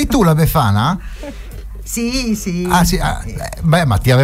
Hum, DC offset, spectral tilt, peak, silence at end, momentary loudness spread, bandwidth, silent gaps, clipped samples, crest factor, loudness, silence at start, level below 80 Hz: none; under 0.1%; -5.5 dB/octave; -2 dBFS; 0 s; 18 LU; 16 kHz; none; under 0.1%; 12 dB; -15 LUFS; 0 s; -26 dBFS